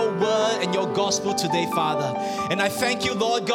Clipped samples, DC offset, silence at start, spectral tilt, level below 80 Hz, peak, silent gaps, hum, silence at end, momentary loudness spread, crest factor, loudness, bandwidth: under 0.1%; under 0.1%; 0 s; -3.5 dB/octave; -60 dBFS; -8 dBFS; none; none; 0 s; 3 LU; 16 dB; -23 LUFS; 18 kHz